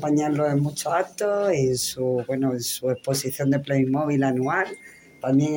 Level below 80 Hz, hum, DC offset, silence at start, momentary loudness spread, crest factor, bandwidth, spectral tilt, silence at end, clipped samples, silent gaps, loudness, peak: -62 dBFS; none; under 0.1%; 0 s; 4 LU; 14 dB; 17 kHz; -5.5 dB/octave; 0 s; under 0.1%; none; -24 LUFS; -10 dBFS